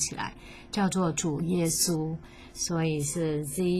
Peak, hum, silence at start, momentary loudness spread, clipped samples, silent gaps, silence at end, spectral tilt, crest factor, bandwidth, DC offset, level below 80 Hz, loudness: -12 dBFS; none; 0 s; 12 LU; under 0.1%; none; 0 s; -4.5 dB/octave; 16 dB; 15.5 kHz; under 0.1%; -52 dBFS; -29 LUFS